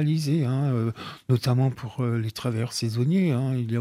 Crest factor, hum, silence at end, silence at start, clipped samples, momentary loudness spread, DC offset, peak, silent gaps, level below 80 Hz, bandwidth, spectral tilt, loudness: 16 dB; none; 0 s; 0 s; under 0.1%; 6 LU; under 0.1%; -10 dBFS; none; -62 dBFS; 15 kHz; -7 dB/octave; -25 LUFS